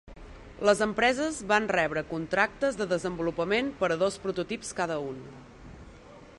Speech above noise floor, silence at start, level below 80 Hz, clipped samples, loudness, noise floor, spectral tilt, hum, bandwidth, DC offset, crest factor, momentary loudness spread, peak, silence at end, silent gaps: 22 dB; 0.05 s; -54 dBFS; under 0.1%; -28 LUFS; -50 dBFS; -4 dB/octave; none; 11.5 kHz; under 0.1%; 20 dB; 21 LU; -8 dBFS; 0.05 s; none